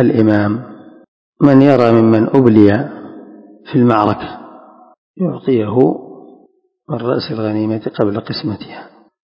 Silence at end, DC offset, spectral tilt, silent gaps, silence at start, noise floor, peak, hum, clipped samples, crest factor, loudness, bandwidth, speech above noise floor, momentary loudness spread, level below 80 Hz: 0.4 s; under 0.1%; -9.5 dB/octave; 1.08-1.33 s, 4.98-5.14 s; 0 s; -53 dBFS; 0 dBFS; none; 0.7%; 14 dB; -13 LUFS; 6.2 kHz; 40 dB; 19 LU; -48 dBFS